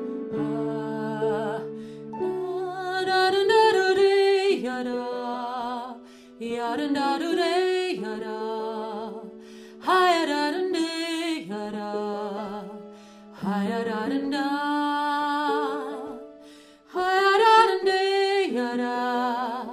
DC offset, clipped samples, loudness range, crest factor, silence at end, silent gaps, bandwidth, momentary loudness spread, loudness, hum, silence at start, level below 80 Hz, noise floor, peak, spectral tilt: under 0.1%; under 0.1%; 7 LU; 20 dB; 0 s; none; 14 kHz; 16 LU; -25 LUFS; none; 0 s; -68 dBFS; -49 dBFS; -6 dBFS; -4.5 dB/octave